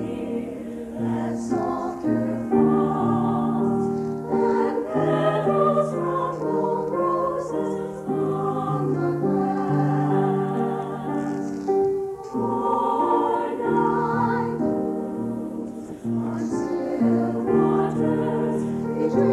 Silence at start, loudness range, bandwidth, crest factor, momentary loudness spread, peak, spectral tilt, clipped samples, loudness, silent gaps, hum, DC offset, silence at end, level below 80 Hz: 0 s; 2 LU; 12 kHz; 16 dB; 8 LU; -8 dBFS; -8.5 dB/octave; under 0.1%; -24 LUFS; none; none; under 0.1%; 0 s; -54 dBFS